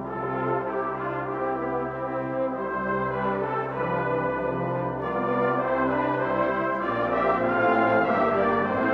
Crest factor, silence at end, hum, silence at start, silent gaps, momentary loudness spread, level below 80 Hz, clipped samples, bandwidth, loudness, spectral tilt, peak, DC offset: 16 dB; 0 s; none; 0 s; none; 7 LU; -54 dBFS; under 0.1%; 6.2 kHz; -25 LUFS; -9 dB/octave; -10 dBFS; under 0.1%